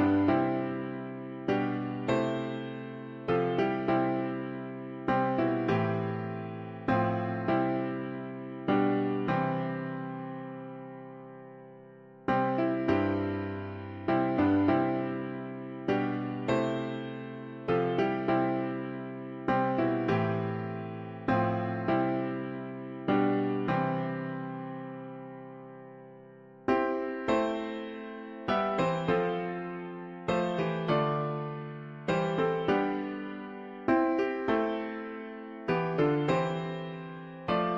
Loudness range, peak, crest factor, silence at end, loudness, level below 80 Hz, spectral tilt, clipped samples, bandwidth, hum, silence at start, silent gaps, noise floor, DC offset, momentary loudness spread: 4 LU; -14 dBFS; 16 dB; 0 s; -31 LUFS; -62 dBFS; -8 dB/octave; under 0.1%; 7.4 kHz; none; 0 s; none; -52 dBFS; under 0.1%; 13 LU